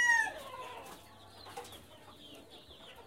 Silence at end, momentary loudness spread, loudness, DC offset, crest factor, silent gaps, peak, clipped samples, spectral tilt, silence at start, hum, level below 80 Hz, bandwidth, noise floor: 0.05 s; 21 LU; -36 LUFS; under 0.1%; 20 dB; none; -18 dBFS; under 0.1%; -0.5 dB/octave; 0 s; none; -70 dBFS; 16 kHz; -55 dBFS